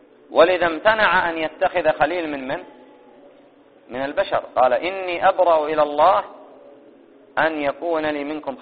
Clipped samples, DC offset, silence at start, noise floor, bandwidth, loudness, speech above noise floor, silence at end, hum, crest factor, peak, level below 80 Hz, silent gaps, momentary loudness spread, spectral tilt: under 0.1%; 0.1%; 0.3 s; -51 dBFS; 4.8 kHz; -20 LUFS; 31 dB; 0 s; none; 20 dB; -2 dBFS; -56 dBFS; none; 12 LU; -1.5 dB/octave